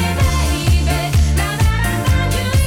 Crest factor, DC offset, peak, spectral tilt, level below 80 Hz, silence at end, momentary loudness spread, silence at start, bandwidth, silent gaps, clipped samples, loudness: 10 dB; 0.2%; -6 dBFS; -5 dB/octave; -18 dBFS; 0 s; 1 LU; 0 s; 17.5 kHz; none; under 0.1%; -16 LUFS